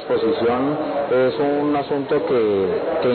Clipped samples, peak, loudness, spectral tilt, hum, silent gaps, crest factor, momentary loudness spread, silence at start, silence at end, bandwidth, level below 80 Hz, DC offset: under 0.1%; -10 dBFS; -20 LUFS; -11.5 dB/octave; none; none; 10 dB; 3 LU; 0 s; 0 s; 4.5 kHz; -54 dBFS; under 0.1%